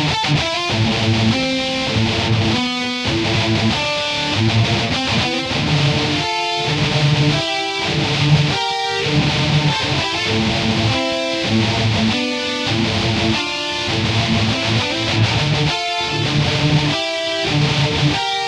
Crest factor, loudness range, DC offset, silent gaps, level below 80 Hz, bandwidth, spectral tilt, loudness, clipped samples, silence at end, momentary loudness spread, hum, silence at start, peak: 14 dB; 1 LU; under 0.1%; none; -38 dBFS; 11.5 kHz; -4.5 dB/octave; -17 LUFS; under 0.1%; 0 s; 3 LU; none; 0 s; -2 dBFS